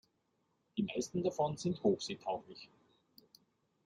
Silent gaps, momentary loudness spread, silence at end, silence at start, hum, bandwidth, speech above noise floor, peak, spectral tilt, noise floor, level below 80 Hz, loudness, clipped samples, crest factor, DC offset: none; 18 LU; 1.2 s; 0.75 s; none; 15.5 kHz; 43 dB; -18 dBFS; -5.5 dB/octave; -80 dBFS; -74 dBFS; -37 LUFS; under 0.1%; 20 dB; under 0.1%